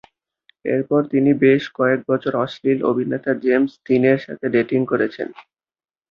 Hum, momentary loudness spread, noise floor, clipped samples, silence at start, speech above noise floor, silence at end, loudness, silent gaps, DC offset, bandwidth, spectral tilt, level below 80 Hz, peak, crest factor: none; 7 LU; -60 dBFS; under 0.1%; 0.65 s; 42 dB; 0.7 s; -19 LUFS; none; under 0.1%; 6.6 kHz; -8.5 dB/octave; -62 dBFS; -2 dBFS; 16 dB